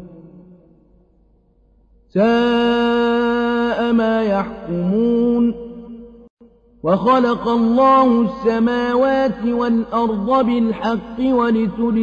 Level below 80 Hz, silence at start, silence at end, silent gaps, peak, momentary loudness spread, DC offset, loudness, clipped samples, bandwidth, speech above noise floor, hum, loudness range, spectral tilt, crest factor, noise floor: -46 dBFS; 0 s; 0 s; 6.30-6.37 s; -4 dBFS; 8 LU; under 0.1%; -17 LUFS; under 0.1%; 6.8 kHz; 39 dB; none; 4 LU; -7.5 dB/octave; 14 dB; -55 dBFS